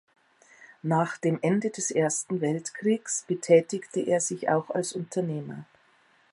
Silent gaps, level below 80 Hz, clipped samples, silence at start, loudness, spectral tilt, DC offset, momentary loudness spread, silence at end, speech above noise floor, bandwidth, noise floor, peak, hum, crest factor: none; -78 dBFS; under 0.1%; 0.6 s; -27 LUFS; -5 dB/octave; under 0.1%; 10 LU; 0.7 s; 36 dB; 11.5 kHz; -63 dBFS; -6 dBFS; none; 22 dB